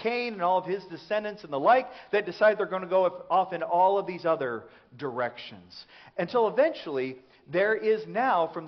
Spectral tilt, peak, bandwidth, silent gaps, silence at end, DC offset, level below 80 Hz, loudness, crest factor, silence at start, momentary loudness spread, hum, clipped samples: -3 dB/octave; -10 dBFS; 6.2 kHz; none; 0 s; under 0.1%; -74 dBFS; -27 LUFS; 18 dB; 0 s; 13 LU; none; under 0.1%